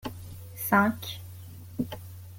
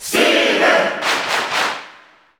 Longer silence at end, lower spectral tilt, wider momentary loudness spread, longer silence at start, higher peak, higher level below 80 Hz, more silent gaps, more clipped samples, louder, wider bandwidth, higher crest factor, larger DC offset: second, 0 s vs 0.5 s; first, -5 dB/octave vs -1.5 dB/octave; first, 20 LU vs 7 LU; about the same, 0.05 s vs 0 s; second, -8 dBFS vs -2 dBFS; about the same, -58 dBFS vs -62 dBFS; neither; neither; second, -28 LUFS vs -15 LUFS; second, 17 kHz vs over 20 kHz; first, 22 dB vs 16 dB; neither